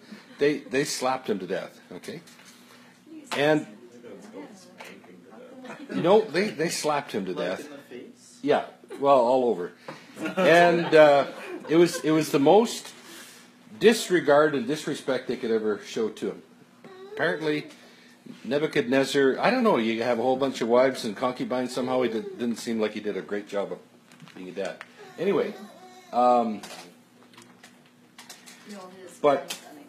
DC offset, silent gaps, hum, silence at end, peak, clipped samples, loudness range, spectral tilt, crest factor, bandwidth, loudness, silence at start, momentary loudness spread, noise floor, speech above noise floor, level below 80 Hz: under 0.1%; none; none; 0.05 s; -2 dBFS; under 0.1%; 10 LU; -4.5 dB/octave; 24 dB; 15 kHz; -24 LUFS; 0.1 s; 24 LU; -56 dBFS; 32 dB; -78 dBFS